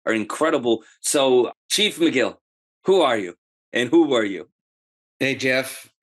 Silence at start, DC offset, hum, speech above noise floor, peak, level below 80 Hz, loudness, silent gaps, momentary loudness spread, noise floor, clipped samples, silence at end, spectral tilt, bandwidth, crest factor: 0.05 s; under 0.1%; none; over 70 dB; -6 dBFS; -74 dBFS; -21 LUFS; 1.57-1.69 s, 2.41-2.81 s, 3.38-3.72 s, 4.52-5.20 s; 10 LU; under -90 dBFS; under 0.1%; 0.2 s; -3 dB/octave; 12.5 kHz; 16 dB